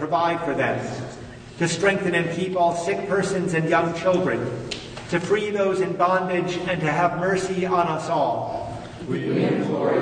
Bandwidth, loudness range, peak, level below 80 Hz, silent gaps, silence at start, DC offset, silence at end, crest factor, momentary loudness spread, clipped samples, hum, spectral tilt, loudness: 9.6 kHz; 1 LU; -6 dBFS; -52 dBFS; none; 0 s; under 0.1%; 0 s; 16 dB; 10 LU; under 0.1%; none; -5.5 dB/octave; -23 LUFS